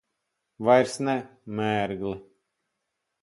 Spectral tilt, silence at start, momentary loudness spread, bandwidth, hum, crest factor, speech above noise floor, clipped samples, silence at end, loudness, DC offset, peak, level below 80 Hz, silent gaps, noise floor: -5.5 dB/octave; 0.6 s; 14 LU; 11.5 kHz; none; 22 dB; 56 dB; under 0.1%; 1 s; -26 LUFS; under 0.1%; -6 dBFS; -62 dBFS; none; -81 dBFS